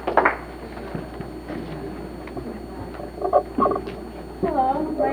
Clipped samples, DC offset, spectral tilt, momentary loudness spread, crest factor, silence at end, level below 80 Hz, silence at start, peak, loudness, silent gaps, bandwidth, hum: under 0.1%; under 0.1%; -7 dB/octave; 14 LU; 24 dB; 0 s; -42 dBFS; 0 s; -2 dBFS; -26 LUFS; none; over 20 kHz; none